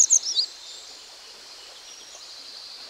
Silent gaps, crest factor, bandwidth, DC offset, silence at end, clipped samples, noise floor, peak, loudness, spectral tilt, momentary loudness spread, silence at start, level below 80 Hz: none; 20 dB; 16 kHz; under 0.1%; 0 s; under 0.1%; -45 dBFS; -8 dBFS; -21 LUFS; 4.5 dB/octave; 22 LU; 0 s; -74 dBFS